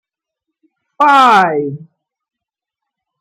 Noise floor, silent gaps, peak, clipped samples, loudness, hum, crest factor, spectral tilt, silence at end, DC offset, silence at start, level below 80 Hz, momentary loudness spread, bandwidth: -84 dBFS; none; 0 dBFS; under 0.1%; -10 LUFS; none; 16 dB; -4.5 dB/octave; 1.4 s; under 0.1%; 1 s; -68 dBFS; 17 LU; 15.5 kHz